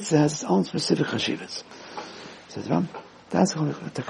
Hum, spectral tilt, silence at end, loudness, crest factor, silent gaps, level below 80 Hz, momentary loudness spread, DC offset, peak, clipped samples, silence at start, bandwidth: none; -5 dB/octave; 0 s; -25 LUFS; 20 dB; none; -66 dBFS; 17 LU; under 0.1%; -6 dBFS; under 0.1%; 0 s; 11 kHz